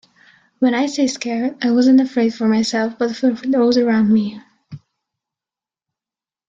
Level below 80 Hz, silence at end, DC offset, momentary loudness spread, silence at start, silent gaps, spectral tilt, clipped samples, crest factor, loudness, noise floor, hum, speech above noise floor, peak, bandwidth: -62 dBFS; 1.7 s; under 0.1%; 7 LU; 0.6 s; none; -5 dB/octave; under 0.1%; 14 dB; -17 LUFS; under -90 dBFS; none; over 74 dB; -4 dBFS; 7.8 kHz